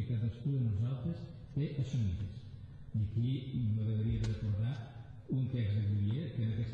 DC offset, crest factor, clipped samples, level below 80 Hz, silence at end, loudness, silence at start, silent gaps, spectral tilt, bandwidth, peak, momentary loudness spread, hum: under 0.1%; 10 dB; under 0.1%; -52 dBFS; 0 s; -36 LUFS; 0 s; none; -9 dB/octave; 7 kHz; -24 dBFS; 10 LU; none